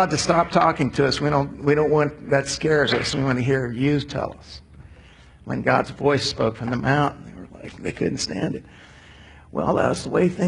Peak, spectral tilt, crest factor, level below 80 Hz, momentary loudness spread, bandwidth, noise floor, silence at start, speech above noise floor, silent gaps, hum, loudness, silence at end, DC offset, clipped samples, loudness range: -4 dBFS; -5.5 dB/octave; 18 dB; -46 dBFS; 13 LU; 11 kHz; -48 dBFS; 0 s; 26 dB; none; none; -22 LUFS; 0 s; under 0.1%; under 0.1%; 6 LU